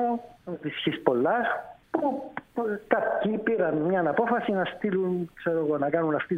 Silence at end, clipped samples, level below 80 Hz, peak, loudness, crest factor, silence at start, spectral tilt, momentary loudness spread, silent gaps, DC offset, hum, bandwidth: 0 s; under 0.1%; -64 dBFS; -6 dBFS; -27 LUFS; 20 dB; 0 s; -8 dB/octave; 9 LU; none; under 0.1%; none; 4.9 kHz